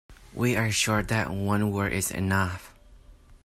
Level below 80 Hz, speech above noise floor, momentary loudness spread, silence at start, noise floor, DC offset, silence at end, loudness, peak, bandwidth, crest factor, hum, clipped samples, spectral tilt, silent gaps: -48 dBFS; 26 dB; 6 LU; 0.1 s; -52 dBFS; under 0.1%; 0.1 s; -26 LUFS; -10 dBFS; 16 kHz; 18 dB; none; under 0.1%; -4.5 dB/octave; none